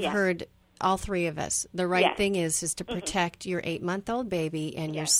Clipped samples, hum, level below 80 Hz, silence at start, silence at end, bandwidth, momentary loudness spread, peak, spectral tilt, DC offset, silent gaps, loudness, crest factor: under 0.1%; none; -52 dBFS; 0 s; 0 s; 16.5 kHz; 8 LU; -8 dBFS; -3.5 dB/octave; under 0.1%; none; -28 LUFS; 20 dB